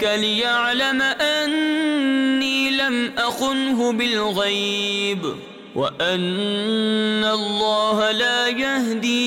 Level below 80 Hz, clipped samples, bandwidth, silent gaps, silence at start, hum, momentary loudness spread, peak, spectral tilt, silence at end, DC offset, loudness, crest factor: -60 dBFS; under 0.1%; 16.5 kHz; none; 0 s; none; 4 LU; -10 dBFS; -3.5 dB/octave; 0 s; under 0.1%; -20 LUFS; 10 dB